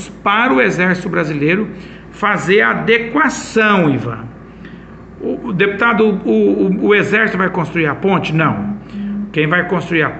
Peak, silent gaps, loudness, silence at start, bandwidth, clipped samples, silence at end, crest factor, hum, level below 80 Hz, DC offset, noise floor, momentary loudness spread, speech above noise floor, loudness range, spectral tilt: 0 dBFS; none; -14 LUFS; 0 s; 8.8 kHz; under 0.1%; 0 s; 14 dB; none; -46 dBFS; under 0.1%; -34 dBFS; 13 LU; 20 dB; 2 LU; -6 dB/octave